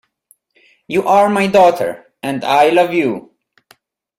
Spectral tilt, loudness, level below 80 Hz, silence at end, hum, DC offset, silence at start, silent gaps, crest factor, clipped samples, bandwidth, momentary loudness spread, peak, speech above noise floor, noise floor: -5.5 dB/octave; -14 LUFS; -58 dBFS; 1 s; none; under 0.1%; 0.9 s; none; 16 dB; under 0.1%; 16 kHz; 12 LU; 0 dBFS; 44 dB; -56 dBFS